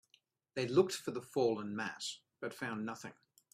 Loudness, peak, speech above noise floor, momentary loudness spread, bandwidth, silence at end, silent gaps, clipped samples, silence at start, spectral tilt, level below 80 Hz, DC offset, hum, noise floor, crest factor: -38 LUFS; -16 dBFS; 37 dB; 14 LU; 15 kHz; 0.4 s; none; under 0.1%; 0.55 s; -4.5 dB/octave; -80 dBFS; under 0.1%; none; -74 dBFS; 22 dB